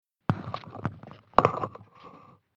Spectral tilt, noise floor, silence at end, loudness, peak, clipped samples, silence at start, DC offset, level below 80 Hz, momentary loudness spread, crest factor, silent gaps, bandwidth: -7.5 dB/octave; -52 dBFS; 0.4 s; -29 LUFS; 0 dBFS; under 0.1%; 0.3 s; under 0.1%; -54 dBFS; 26 LU; 32 dB; none; 7.6 kHz